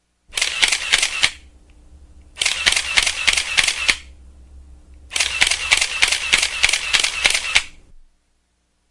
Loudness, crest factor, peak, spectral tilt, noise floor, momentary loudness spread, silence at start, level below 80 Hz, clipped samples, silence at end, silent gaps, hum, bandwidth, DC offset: -16 LUFS; 20 dB; 0 dBFS; 1.5 dB/octave; -66 dBFS; 6 LU; 0.3 s; -42 dBFS; under 0.1%; 1.15 s; none; none; 12 kHz; 0.1%